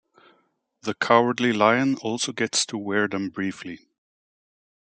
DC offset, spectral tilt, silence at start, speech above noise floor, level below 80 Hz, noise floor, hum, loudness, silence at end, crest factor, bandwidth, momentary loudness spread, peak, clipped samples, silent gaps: under 0.1%; -3.5 dB/octave; 0.85 s; 44 dB; -72 dBFS; -67 dBFS; none; -23 LUFS; 1.1 s; 22 dB; 9.4 kHz; 15 LU; -2 dBFS; under 0.1%; none